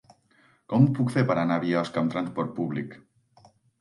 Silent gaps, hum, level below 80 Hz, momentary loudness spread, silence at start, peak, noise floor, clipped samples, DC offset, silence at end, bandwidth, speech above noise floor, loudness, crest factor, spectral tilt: none; none; -70 dBFS; 9 LU; 0.7 s; -8 dBFS; -62 dBFS; under 0.1%; under 0.1%; 0.85 s; 11.5 kHz; 38 dB; -26 LUFS; 20 dB; -8 dB/octave